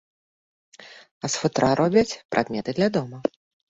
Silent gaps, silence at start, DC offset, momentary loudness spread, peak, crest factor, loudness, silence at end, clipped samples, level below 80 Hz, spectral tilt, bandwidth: 1.11-1.21 s, 2.25-2.29 s; 0.8 s; under 0.1%; 11 LU; -4 dBFS; 20 dB; -24 LUFS; 0.4 s; under 0.1%; -56 dBFS; -5 dB/octave; 8.2 kHz